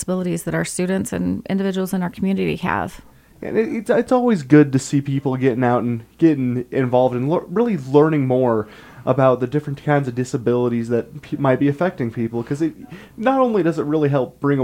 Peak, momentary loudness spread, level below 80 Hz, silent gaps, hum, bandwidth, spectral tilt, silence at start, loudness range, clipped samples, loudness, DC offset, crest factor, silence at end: 0 dBFS; 7 LU; -52 dBFS; none; none; 16 kHz; -7 dB/octave; 0 s; 4 LU; under 0.1%; -19 LUFS; under 0.1%; 18 dB; 0 s